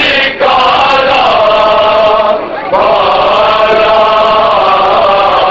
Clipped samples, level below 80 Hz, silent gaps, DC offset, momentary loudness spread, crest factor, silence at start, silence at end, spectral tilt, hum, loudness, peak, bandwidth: under 0.1%; -36 dBFS; none; under 0.1%; 2 LU; 8 dB; 0 s; 0 s; -4 dB/octave; none; -7 LUFS; 0 dBFS; 7.8 kHz